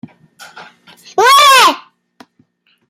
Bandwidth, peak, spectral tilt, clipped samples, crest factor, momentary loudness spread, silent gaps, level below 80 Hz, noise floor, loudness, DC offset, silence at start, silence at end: 16.5 kHz; 0 dBFS; 0.5 dB/octave; under 0.1%; 14 dB; 17 LU; none; -68 dBFS; -56 dBFS; -7 LUFS; under 0.1%; 1.15 s; 1.1 s